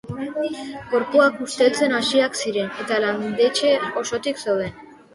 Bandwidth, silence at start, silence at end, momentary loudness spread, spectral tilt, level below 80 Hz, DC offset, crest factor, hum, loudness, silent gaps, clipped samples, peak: 11.5 kHz; 0.05 s; 0.2 s; 9 LU; -3.5 dB/octave; -60 dBFS; under 0.1%; 18 dB; none; -21 LUFS; none; under 0.1%; -4 dBFS